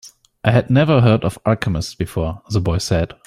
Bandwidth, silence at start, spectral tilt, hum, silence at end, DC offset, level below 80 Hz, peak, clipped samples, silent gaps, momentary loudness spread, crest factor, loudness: 14 kHz; 0.05 s; -6.5 dB/octave; none; 0.2 s; under 0.1%; -38 dBFS; -2 dBFS; under 0.1%; none; 9 LU; 16 dB; -18 LUFS